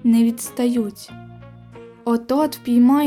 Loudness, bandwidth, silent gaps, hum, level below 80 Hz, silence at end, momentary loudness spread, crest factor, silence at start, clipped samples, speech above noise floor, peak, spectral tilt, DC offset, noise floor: -20 LUFS; 15 kHz; none; none; -58 dBFS; 0 s; 22 LU; 12 dB; 0.05 s; under 0.1%; 24 dB; -8 dBFS; -5.5 dB/octave; under 0.1%; -41 dBFS